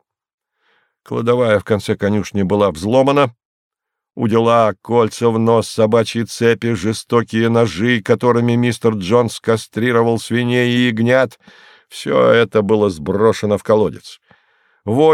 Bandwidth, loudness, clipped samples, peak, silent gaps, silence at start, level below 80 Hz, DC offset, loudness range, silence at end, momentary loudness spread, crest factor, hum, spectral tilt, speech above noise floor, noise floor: 14 kHz; -15 LUFS; under 0.1%; 0 dBFS; 3.45-3.71 s; 1.1 s; -52 dBFS; under 0.1%; 1 LU; 0 s; 6 LU; 14 dB; none; -6 dB/octave; 47 dB; -62 dBFS